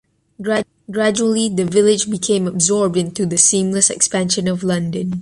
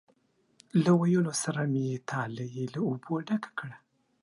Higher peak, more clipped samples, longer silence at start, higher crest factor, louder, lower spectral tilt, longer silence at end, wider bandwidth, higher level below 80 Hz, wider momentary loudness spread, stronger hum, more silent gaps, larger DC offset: first, 0 dBFS vs -12 dBFS; neither; second, 0.4 s vs 0.75 s; about the same, 18 dB vs 18 dB; first, -16 LUFS vs -30 LUFS; second, -3.5 dB/octave vs -6 dB/octave; second, 0 s vs 0.45 s; about the same, 11.5 kHz vs 11.5 kHz; first, -54 dBFS vs -74 dBFS; second, 8 LU vs 12 LU; neither; neither; neither